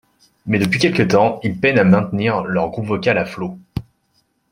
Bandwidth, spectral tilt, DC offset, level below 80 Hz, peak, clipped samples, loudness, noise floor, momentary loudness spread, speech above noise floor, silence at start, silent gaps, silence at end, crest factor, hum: 15 kHz; -6.5 dB/octave; under 0.1%; -50 dBFS; -2 dBFS; under 0.1%; -17 LUFS; -64 dBFS; 15 LU; 48 dB; 0.45 s; none; 0.7 s; 16 dB; none